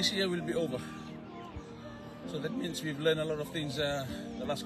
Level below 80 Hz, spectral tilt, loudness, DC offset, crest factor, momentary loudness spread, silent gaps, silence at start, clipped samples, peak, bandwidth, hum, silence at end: -58 dBFS; -4.5 dB/octave; -35 LUFS; under 0.1%; 20 dB; 15 LU; none; 0 s; under 0.1%; -16 dBFS; 13 kHz; none; 0 s